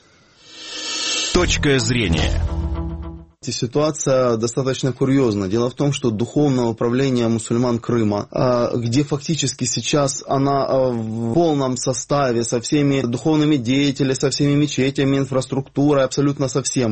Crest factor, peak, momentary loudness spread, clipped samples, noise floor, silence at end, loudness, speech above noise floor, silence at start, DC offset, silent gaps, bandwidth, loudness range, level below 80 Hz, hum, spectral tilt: 16 dB; -2 dBFS; 6 LU; under 0.1%; -50 dBFS; 0 s; -19 LUFS; 32 dB; 0.5 s; 0.2%; none; 8.8 kHz; 2 LU; -34 dBFS; none; -5 dB/octave